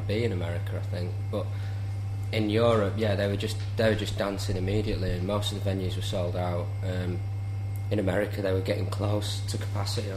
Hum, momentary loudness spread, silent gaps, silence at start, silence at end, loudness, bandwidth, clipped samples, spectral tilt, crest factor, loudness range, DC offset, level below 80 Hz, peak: none; 7 LU; none; 0 s; 0 s; -29 LUFS; 14 kHz; under 0.1%; -6.5 dB/octave; 18 dB; 3 LU; under 0.1%; -46 dBFS; -10 dBFS